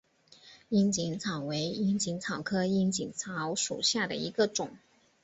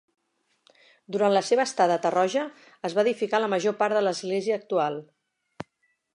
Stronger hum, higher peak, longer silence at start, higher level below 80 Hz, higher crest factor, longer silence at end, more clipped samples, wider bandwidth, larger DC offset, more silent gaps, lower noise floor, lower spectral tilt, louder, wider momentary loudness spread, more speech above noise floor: neither; second, -14 dBFS vs -8 dBFS; second, 0.45 s vs 1.1 s; first, -66 dBFS vs -78 dBFS; about the same, 18 dB vs 18 dB; about the same, 0.45 s vs 0.5 s; neither; second, 8.4 kHz vs 11 kHz; neither; neither; second, -58 dBFS vs -72 dBFS; about the same, -4 dB/octave vs -4.5 dB/octave; second, -31 LUFS vs -25 LUFS; second, 7 LU vs 15 LU; second, 27 dB vs 48 dB